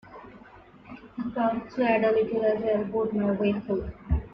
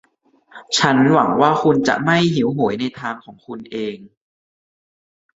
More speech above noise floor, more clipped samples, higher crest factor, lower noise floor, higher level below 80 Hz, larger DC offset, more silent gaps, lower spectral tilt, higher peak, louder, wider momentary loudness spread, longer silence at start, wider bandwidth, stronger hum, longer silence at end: second, 25 dB vs 38 dB; neither; about the same, 16 dB vs 18 dB; second, -51 dBFS vs -55 dBFS; first, -42 dBFS vs -58 dBFS; neither; neither; first, -9.5 dB/octave vs -5 dB/octave; second, -12 dBFS vs -2 dBFS; second, -27 LUFS vs -17 LUFS; first, 21 LU vs 18 LU; second, 0.05 s vs 0.55 s; second, 5.8 kHz vs 8 kHz; neither; second, 0 s vs 1.35 s